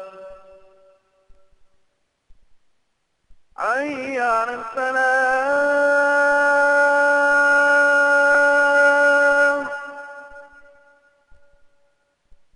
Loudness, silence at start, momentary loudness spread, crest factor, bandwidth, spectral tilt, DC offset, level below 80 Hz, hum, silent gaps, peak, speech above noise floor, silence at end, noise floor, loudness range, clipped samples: -17 LUFS; 0 s; 12 LU; 14 dB; 11 kHz; -2 dB/octave; under 0.1%; -60 dBFS; none; none; -6 dBFS; 47 dB; 2.1 s; -69 dBFS; 12 LU; under 0.1%